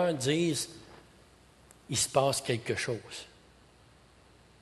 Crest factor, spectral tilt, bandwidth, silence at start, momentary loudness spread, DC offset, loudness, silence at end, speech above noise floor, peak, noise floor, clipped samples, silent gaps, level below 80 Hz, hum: 22 dB; -4 dB/octave; 12.5 kHz; 0 s; 17 LU; under 0.1%; -30 LUFS; 1.35 s; 29 dB; -12 dBFS; -59 dBFS; under 0.1%; none; -62 dBFS; none